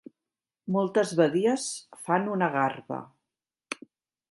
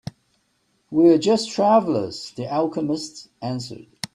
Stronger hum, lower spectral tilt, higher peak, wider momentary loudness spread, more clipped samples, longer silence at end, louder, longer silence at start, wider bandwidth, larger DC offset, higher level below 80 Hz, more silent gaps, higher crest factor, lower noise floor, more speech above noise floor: neither; about the same, -5 dB/octave vs -5.5 dB/octave; second, -8 dBFS vs -4 dBFS; about the same, 16 LU vs 18 LU; neither; first, 0.6 s vs 0.1 s; second, -27 LUFS vs -21 LUFS; second, 0.65 s vs 0.9 s; about the same, 11.5 kHz vs 12 kHz; neither; second, -78 dBFS vs -64 dBFS; neither; about the same, 20 dB vs 18 dB; first, under -90 dBFS vs -67 dBFS; first, over 64 dB vs 47 dB